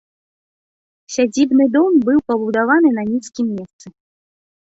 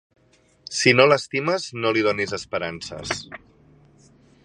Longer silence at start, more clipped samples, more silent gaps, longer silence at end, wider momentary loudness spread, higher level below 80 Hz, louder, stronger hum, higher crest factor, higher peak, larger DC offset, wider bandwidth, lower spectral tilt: first, 1.1 s vs 0.7 s; neither; first, 3.73-3.79 s vs none; second, 0.8 s vs 1.1 s; second, 9 LU vs 15 LU; about the same, -60 dBFS vs -58 dBFS; first, -16 LUFS vs -21 LUFS; neither; second, 14 dB vs 24 dB; about the same, -2 dBFS vs 0 dBFS; neither; second, 8 kHz vs 11 kHz; about the same, -5 dB/octave vs -4 dB/octave